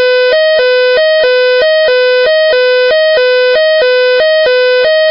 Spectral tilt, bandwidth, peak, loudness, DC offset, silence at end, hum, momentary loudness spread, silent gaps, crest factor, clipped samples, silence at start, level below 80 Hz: -4 dB/octave; 5.8 kHz; -2 dBFS; -8 LUFS; under 0.1%; 0 s; none; 0 LU; none; 6 dB; under 0.1%; 0 s; -52 dBFS